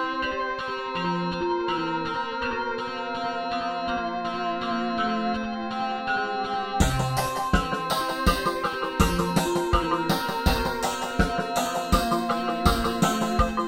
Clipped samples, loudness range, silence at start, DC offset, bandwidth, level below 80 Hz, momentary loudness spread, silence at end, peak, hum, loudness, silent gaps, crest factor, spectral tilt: under 0.1%; 3 LU; 0 s; under 0.1%; 16.5 kHz; -36 dBFS; 5 LU; 0 s; -6 dBFS; none; -26 LUFS; none; 20 dB; -5 dB/octave